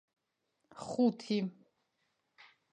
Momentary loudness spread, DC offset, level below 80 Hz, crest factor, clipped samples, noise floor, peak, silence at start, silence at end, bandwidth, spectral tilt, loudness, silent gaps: 12 LU; under 0.1%; -82 dBFS; 20 dB; under 0.1%; -82 dBFS; -18 dBFS; 0.75 s; 1.2 s; 9.8 kHz; -6.5 dB/octave; -34 LUFS; none